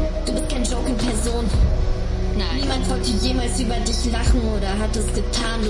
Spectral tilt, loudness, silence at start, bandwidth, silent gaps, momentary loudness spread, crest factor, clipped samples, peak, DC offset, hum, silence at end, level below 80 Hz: -5 dB/octave; -22 LUFS; 0 s; 11.5 kHz; none; 3 LU; 14 dB; under 0.1%; -6 dBFS; under 0.1%; none; 0 s; -22 dBFS